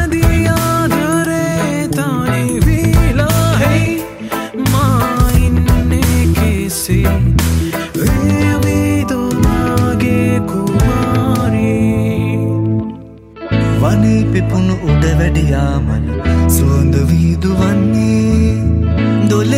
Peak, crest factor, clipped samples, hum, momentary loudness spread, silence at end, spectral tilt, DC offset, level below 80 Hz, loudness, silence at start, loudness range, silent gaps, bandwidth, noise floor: 0 dBFS; 12 dB; under 0.1%; none; 4 LU; 0 s; -6.5 dB/octave; under 0.1%; -20 dBFS; -13 LUFS; 0 s; 2 LU; none; 16.5 kHz; -32 dBFS